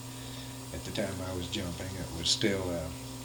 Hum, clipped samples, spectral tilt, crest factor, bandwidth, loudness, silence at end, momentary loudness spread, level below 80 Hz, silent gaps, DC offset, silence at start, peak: none; under 0.1%; -3.5 dB/octave; 22 dB; 19 kHz; -34 LUFS; 0 s; 13 LU; -52 dBFS; none; under 0.1%; 0 s; -14 dBFS